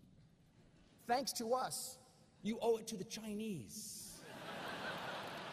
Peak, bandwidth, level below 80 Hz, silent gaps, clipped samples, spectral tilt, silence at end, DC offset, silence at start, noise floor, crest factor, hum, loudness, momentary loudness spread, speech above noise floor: -24 dBFS; 15 kHz; -76 dBFS; none; under 0.1%; -3.5 dB/octave; 0 s; under 0.1%; 0 s; -67 dBFS; 20 dB; none; -43 LUFS; 11 LU; 26 dB